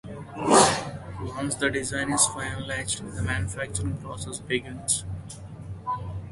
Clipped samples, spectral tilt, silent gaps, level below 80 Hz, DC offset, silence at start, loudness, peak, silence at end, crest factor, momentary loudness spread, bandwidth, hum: under 0.1%; -3.5 dB/octave; none; -44 dBFS; under 0.1%; 0.05 s; -26 LUFS; -2 dBFS; 0 s; 24 dB; 16 LU; 12 kHz; none